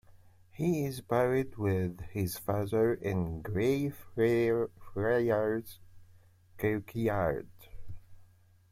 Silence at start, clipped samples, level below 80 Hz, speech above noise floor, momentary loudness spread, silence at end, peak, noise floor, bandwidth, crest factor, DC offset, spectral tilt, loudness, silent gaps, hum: 0.15 s; under 0.1%; -56 dBFS; 30 dB; 9 LU; 0.45 s; -16 dBFS; -60 dBFS; 16.5 kHz; 16 dB; under 0.1%; -7 dB/octave; -32 LUFS; none; none